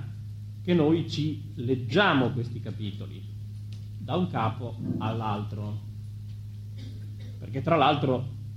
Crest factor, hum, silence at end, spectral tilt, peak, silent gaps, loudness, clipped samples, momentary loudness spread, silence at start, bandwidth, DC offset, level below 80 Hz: 20 dB; none; 0 s; -7.5 dB/octave; -8 dBFS; none; -28 LUFS; under 0.1%; 17 LU; 0 s; 8.2 kHz; under 0.1%; -54 dBFS